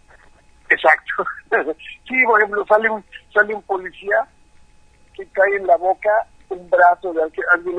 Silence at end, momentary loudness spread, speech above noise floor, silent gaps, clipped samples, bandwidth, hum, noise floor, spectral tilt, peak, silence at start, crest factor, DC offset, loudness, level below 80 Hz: 0 s; 14 LU; 32 dB; none; under 0.1%; 9.2 kHz; none; -50 dBFS; -5 dB/octave; 0 dBFS; 0.7 s; 18 dB; under 0.1%; -18 LUFS; -54 dBFS